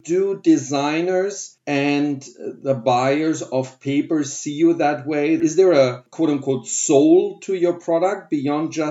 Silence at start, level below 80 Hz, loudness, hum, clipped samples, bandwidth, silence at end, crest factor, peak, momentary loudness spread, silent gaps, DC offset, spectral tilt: 0.05 s; -78 dBFS; -19 LUFS; none; under 0.1%; 8 kHz; 0 s; 18 dB; -2 dBFS; 9 LU; none; under 0.1%; -5 dB/octave